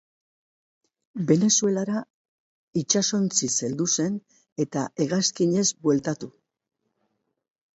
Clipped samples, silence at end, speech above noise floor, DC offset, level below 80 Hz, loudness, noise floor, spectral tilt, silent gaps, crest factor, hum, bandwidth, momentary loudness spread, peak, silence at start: under 0.1%; 1.45 s; 51 dB; under 0.1%; -68 dBFS; -24 LUFS; -75 dBFS; -4 dB/octave; 2.10-2.73 s, 4.52-4.56 s; 22 dB; none; 8.2 kHz; 11 LU; -4 dBFS; 1.15 s